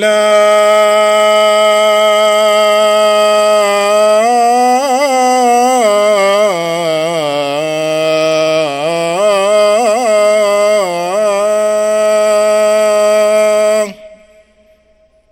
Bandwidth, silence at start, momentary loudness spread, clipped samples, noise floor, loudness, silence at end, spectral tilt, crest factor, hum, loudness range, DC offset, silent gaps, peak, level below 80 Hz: 16.5 kHz; 0 s; 6 LU; under 0.1%; -50 dBFS; -10 LUFS; 1.15 s; -2.5 dB/octave; 10 dB; none; 3 LU; under 0.1%; none; 0 dBFS; -56 dBFS